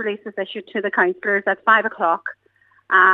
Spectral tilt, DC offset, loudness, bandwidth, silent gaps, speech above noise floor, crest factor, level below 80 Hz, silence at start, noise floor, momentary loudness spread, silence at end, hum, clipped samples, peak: -6 dB/octave; under 0.1%; -19 LUFS; 7 kHz; none; 36 dB; 18 dB; -78 dBFS; 0 s; -56 dBFS; 12 LU; 0 s; none; under 0.1%; 0 dBFS